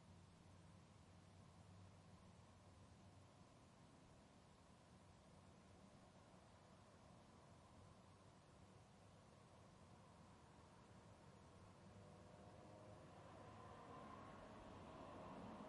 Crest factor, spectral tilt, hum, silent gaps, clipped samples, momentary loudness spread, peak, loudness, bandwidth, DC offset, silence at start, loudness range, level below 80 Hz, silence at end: 18 dB; -5.5 dB/octave; none; none; under 0.1%; 9 LU; -46 dBFS; -65 LUFS; 11 kHz; under 0.1%; 0 s; 7 LU; -80 dBFS; 0 s